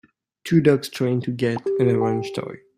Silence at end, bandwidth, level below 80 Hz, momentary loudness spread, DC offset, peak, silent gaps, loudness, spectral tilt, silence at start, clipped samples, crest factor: 0.2 s; 15.5 kHz; -60 dBFS; 12 LU; under 0.1%; -4 dBFS; none; -21 LUFS; -7 dB/octave; 0.45 s; under 0.1%; 18 dB